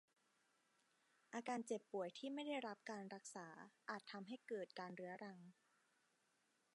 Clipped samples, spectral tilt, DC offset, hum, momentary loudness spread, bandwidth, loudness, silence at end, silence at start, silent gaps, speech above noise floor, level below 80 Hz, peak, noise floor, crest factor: under 0.1%; -4 dB/octave; under 0.1%; none; 10 LU; 11 kHz; -51 LUFS; 1.2 s; 1.3 s; none; 33 dB; under -90 dBFS; -32 dBFS; -84 dBFS; 20 dB